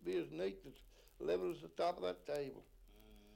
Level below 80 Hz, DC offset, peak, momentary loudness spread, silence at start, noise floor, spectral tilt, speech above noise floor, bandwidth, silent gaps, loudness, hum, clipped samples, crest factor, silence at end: -66 dBFS; under 0.1%; -28 dBFS; 19 LU; 0 s; -63 dBFS; -6 dB/octave; 20 dB; 16.5 kHz; none; -43 LUFS; none; under 0.1%; 16 dB; 0 s